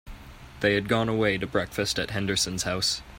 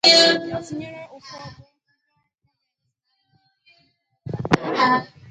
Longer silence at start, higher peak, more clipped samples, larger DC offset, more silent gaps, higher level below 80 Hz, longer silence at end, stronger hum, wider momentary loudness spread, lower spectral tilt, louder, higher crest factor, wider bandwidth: about the same, 0.05 s vs 0.05 s; second, -8 dBFS vs 0 dBFS; neither; neither; neither; first, -48 dBFS vs -56 dBFS; second, 0 s vs 0.25 s; neither; second, 4 LU vs 25 LU; about the same, -3.5 dB/octave vs -3 dB/octave; second, -26 LUFS vs -19 LUFS; second, 18 dB vs 24 dB; first, 16 kHz vs 9.6 kHz